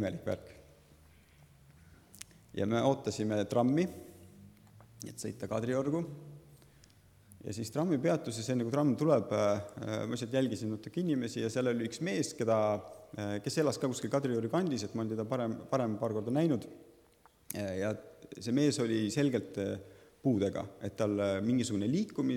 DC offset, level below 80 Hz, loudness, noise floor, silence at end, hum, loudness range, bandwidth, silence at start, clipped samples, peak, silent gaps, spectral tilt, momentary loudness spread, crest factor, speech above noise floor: under 0.1%; -70 dBFS; -33 LUFS; -65 dBFS; 0 s; none; 4 LU; 17.5 kHz; 0 s; under 0.1%; -14 dBFS; none; -6 dB/octave; 13 LU; 20 dB; 32 dB